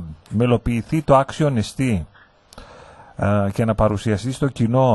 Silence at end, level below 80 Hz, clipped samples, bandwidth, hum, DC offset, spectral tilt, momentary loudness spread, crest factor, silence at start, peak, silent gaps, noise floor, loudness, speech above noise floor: 0 s; -38 dBFS; under 0.1%; 12 kHz; none; under 0.1%; -7.5 dB/octave; 9 LU; 18 dB; 0 s; -2 dBFS; none; -45 dBFS; -20 LUFS; 27 dB